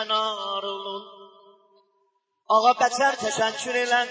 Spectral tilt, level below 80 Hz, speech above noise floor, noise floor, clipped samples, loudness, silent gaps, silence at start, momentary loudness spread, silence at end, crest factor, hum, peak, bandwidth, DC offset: -1.5 dB/octave; -76 dBFS; 49 dB; -71 dBFS; under 0.1%; -23 LUFS; none; 0 s; 12 LU; 0 s; 18 dB; none; -6 dBFS; 8 kHz; under 0.1%